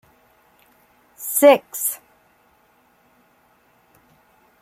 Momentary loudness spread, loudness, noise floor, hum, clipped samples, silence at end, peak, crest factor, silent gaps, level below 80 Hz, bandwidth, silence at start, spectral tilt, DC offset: 19 LU; -17 LUFS; -59 dBFS; none; under 0.1%; 2.65 s; -2 dBFS; 22 dB; none; -74 dBFS; 16.5 kHz; 1.2 s; -2 dB/octave; under 0.1%